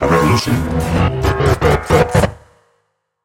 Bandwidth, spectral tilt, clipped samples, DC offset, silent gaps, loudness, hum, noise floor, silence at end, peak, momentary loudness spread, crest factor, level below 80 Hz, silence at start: 17 kHz; -6 dB/octave; under 0.1%; under 0.1%; none; -15 LUFS; none; -66 dBFS; 0.9 s; 0 dBFS; 5 LU; 14 dB; -28 dBFS; 0 s